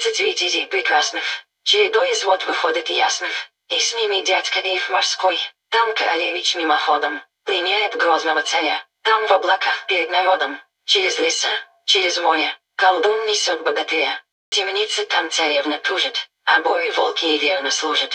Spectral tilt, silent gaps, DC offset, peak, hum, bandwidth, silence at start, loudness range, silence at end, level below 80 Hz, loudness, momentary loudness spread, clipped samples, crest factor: 1.5 dB/octave; 14.32-14.52 s; under 0.1%; -2 dBFS; none; 10.5 kHz; 0 s; 1 LU; 0 s; -76 dBFS; -18 LUFS; 6 LU; under 0.1%; 18 dB